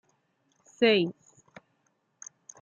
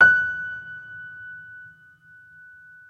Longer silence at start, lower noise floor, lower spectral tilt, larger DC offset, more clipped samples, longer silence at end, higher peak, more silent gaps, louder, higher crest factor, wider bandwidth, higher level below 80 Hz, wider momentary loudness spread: first, 0.8 s vs 0 s; first, -74 dBFS vs -51 dBFS; about the same, -4.5 dB/octave vs -4 dB/octave; neither; neither; first, 1.5 s vs 1.25 s; second, -10 dBFS vs -4 dBFS; neither; about the same, -25 LUFS vs -23 LUFS; about the same, 22 dB vs 22 dB; first, 7.6 kHz vs 6.4 kHz; second, -84 dBFS vs -62 dBFS; about the same, 24 LU vs 25 LU